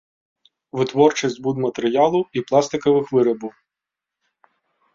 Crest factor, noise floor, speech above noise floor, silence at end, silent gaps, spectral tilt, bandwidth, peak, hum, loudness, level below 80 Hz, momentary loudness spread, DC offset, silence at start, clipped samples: 20 dB; -86 dBFS; 67 dB; 1.45 s; none; -5.5 dB/octave; 7.8 kHz; -2 dBFS; none; -19 LUFS; -64 dBFS; 8 LU; under 0.1%; 0.75 s; under 0.1%